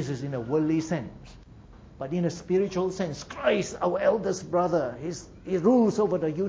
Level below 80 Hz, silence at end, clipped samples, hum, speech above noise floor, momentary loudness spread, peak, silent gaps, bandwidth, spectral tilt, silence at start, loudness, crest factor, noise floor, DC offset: -54 dBFS; 0 s; under 0.1%; none; 22 dB; 10 LU; -10 dBFS; none; 8 kHz; -6.5 dB/octave; 0 s; -27 LUFS; 18 dB; -49 dBFS; under 0.1%